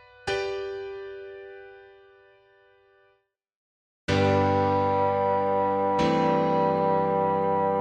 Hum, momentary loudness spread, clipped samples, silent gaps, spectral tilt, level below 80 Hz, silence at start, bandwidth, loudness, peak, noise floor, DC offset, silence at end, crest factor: none; 17 LU; under 0.1%; 3.55-4.08 s; -7 dB/octave; -58 dBFS; 0.25 s; 9.4 kHz; -24 LUFS; -10 dBFS; -69 dBFS; under 0.1%; 0 s; 16 dB